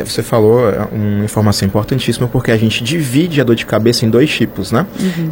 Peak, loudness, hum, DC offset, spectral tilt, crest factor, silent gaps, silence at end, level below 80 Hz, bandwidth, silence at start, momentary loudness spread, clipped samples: 0 dBFS; -13 LUFS; none; under 0.1%; -6 dB/octave; 12 dB; none; 0 s; -38 dBFS; 17 kHz; 0 s; 5 LU; under 0.1%